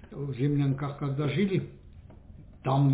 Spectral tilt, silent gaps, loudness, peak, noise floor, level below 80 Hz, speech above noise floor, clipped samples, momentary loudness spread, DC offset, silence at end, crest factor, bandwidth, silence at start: -12 dB/octave; none; -29 LUFS; -16 dBFS; -49 dBFS; -54 dBFS; 22 dB; under 0.1%; 10 LU; under 0.1%; 0 s; 14 dB; 4 kHz; 0 s